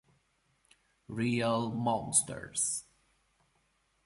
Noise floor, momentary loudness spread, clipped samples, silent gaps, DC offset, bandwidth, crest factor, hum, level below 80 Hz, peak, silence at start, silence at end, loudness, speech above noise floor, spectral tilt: -74 dBFS; 9 LU; under 0.1%; none; under 0.1%; 11.5 kHz; 24 dB; none; -66 dBFS; -12 dBFS; 1.1 s; 1.25 s; -31 LUFS; 42 dB; -3.5 dB/octave